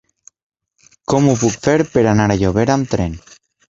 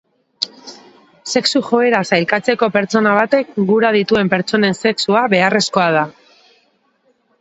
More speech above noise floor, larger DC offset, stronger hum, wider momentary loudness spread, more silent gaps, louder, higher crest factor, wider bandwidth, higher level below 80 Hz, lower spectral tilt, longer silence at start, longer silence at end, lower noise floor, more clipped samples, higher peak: second, 40 dB vs 46 dB; neither; neither; about the same, 9 LU vs 9 LU; neither; about the same, -16 LUFS vs -15 LUFS; about the same, 16 dB vs 16 dB; about the same, 7.8 kHz vs 8.2 kHz; first, -38 dBFS vs -58 dBFS; first, -6 dB/octave vs -4.5 dB/octave; first, 1.1 s vs 0.4 s; second, 0.5 s vs 1.3 s; second, -54 dBFS vs -60 dBFS; neither; about the same, -2 dBFS vs 0 dBFS